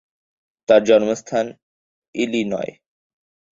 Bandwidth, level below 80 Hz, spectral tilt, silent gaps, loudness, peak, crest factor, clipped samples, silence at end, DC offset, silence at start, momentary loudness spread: 7.8 kHz; -62 dBFS; -5 dB/octave; 1.63-2.02 s, 2.08-2.13 s; -19 LUFS; -2 dBFS; 20 dB; under 0.1%; 0.85 s; under 0.1%; 0.7 s; 18 LU